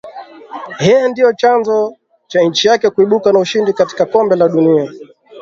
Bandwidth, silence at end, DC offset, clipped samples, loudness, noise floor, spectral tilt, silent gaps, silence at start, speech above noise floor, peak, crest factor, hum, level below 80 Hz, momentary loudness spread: 7.6 kHz; 0 s; under 0.1%; under 0.1%; -12 LUFS; -32 dBFS; -5 dB/octave; none; 0.05 s; 20 dB; 0 dBFS; 12 dB; none; -56 dBFS; 13 LU